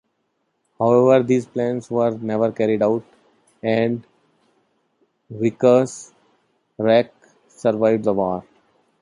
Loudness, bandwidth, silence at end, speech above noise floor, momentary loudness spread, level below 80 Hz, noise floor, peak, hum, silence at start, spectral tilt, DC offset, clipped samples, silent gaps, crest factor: -19 LUFS; 11 kHz; 0.6 s; 53 dB; 12 LU; -62 dBFS; -71 dBFS; -2 dBFS; none; 0.8 s; -7 dB/octave; under 0.1%; under 0.1%; none; 18 dB